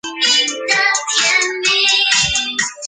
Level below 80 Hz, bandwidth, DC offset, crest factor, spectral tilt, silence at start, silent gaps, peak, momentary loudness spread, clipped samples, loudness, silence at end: -46 dBFS; 10 kHz; under 0.1%; 16 dB; 0.5 dB/octave; 0.05 s; none; 0 dBFS; 4 LU; under 0.1%; -13 LUFS; 0 s